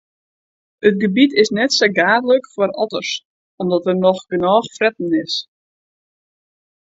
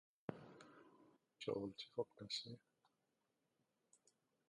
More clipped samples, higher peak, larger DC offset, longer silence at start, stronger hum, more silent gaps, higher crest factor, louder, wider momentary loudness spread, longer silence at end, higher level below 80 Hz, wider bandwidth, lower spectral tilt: neither; first, 0 dBFS vs -28 dBFS; neither; first, 0.85 s vs 0.3 s; neither; first, 3.25-3.58 s vs none; second, 18 dB vs 26 dB; first, -17 LUFS vs -49 LUFS; second, 9 LU vs 18 LU; second, 1.4 s vs 1.9 s; first, -62 dBFS vs -86 dBFS; second, 8 kHz vs 11 kHz; about the same, -4.5 dB/octave vs -4.5 dB/octave